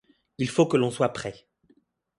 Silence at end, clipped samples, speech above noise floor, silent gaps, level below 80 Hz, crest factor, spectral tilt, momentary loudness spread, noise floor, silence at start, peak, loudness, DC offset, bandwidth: 0.85 s; under 0.1%; 40 dB; none; -62 dBFS; 20 dB; -6 dB/octave; 13 LU; -65 dBFS; 0.4 s; -6 dBFS; -25 LUFS; under 0.1%; 11.5 kHz